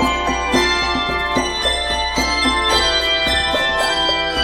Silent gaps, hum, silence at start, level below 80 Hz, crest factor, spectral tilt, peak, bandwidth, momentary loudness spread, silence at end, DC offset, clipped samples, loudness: none; none; 0 s; -32 dBFS; 16 dB; -2.5 dB/octave; -2 dBFS; 16.5 kHz; 4 LU; 0 s; under 0.1%; under 0.1%; -16 LUFS